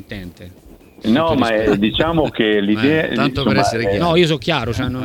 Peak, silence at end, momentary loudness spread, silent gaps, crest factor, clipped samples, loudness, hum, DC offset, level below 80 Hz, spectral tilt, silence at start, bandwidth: 0 dBFS; 0 s; 6 LU; none; 16 dB; under 0.1%; -16 LUFS; none; under 0.1%; -38 dBFS; -6 dB/octave; 0.1 s; 17.5 kHz